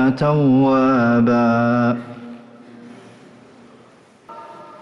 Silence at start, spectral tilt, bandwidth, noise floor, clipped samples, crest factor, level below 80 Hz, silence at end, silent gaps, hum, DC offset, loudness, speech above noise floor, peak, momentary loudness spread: 0 s; -9 dB/octave; 6.4 kHz; -49 dBFS; under 0.1%; 12 dB; -54 dBFS; 0.1 s; none; none; under 0.1%; -16 LUFS; 33 dB; -8 dBFS; 23 LU